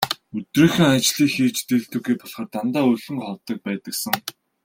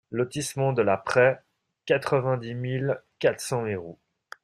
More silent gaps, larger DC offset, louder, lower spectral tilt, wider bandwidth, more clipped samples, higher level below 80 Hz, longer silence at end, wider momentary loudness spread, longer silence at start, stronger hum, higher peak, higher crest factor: neither; neither; first, -21 LUFS vs -26 LUFS; about the same, -4.5 dB/octave vs -5.5 dB/octave; first, 16.5 kHz vs 14 kHz; neither; first, -58 dBFS vs -64 dBFS; second, 0.35 s vs 0.5 s; about the same, 13 LU vs 12 LU; about the same, 0 s vs 0.1 s; neither; first, 0 dBFS vs -6 dBFS; about the same, 20 dB vs 20 dB